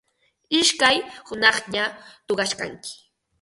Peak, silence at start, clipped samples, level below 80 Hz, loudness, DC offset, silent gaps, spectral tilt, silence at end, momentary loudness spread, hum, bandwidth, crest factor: -2 dBFS; 0.5 s; under 0.1%; -62 dBFS; -21 LUFS; under 0.1%; none; -1 dB/octave; 0.45 s; 16 LU; none; 11.5 kHz; 24 dB